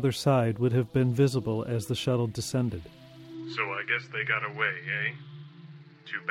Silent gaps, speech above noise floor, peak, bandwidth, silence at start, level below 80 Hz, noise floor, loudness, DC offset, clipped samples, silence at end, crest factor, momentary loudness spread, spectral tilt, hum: none; 21 dB; -10 dBFS; 15 kHz; 0 s; -60 dBFS; -49 dBFS; -28 LUFS; under 0.1%; under 0.1%; 0 s; 18 dB; 21 LU; -6 dB/octave; none